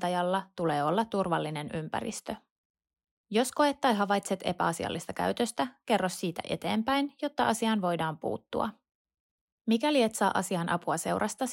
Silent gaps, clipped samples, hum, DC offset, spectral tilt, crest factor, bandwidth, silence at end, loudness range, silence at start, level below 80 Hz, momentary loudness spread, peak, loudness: 2.50-2.74 s, 3.11-3.24 s, 8.95-9.05 s, 9.20-9.65 s; under 0.1%; none; under 0.1%; -4.5 dB/octave; 18 dB; 16 kHz; 0 s; 2 LU; 0 s; -66 dBFS; 8 LU; -12 dBFS; -30 LUFS